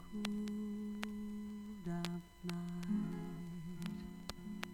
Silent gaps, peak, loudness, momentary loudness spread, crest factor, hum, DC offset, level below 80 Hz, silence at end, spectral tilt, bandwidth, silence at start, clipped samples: none; -20 dBFS; -44 LUFS; 8 LU; 24 dB; none; under 0.1%; -62 dBFS; 0 s; -6 dB/octave; 17 kHz; 0 s; under 0.1%